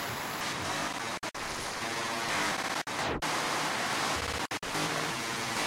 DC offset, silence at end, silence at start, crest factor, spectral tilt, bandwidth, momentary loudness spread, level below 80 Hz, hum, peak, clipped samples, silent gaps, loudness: under 0.1%; 0 s; 0 s; 16 dB; -2 dB/octave; 16 kHz; 5 LU; -56 dBFS; none; -16 dBFS; under 0.1%; none; -32 LUFS